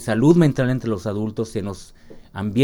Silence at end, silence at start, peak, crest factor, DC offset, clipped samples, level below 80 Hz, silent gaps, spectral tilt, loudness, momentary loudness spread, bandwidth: 0 s; 0 s; -2 dBFS; 18 dB; under 0.1%; under 0.1%; -46 dBFS; none; -7.5 dB/octave; -20 LUFS; 17 LU; 16.5 kHz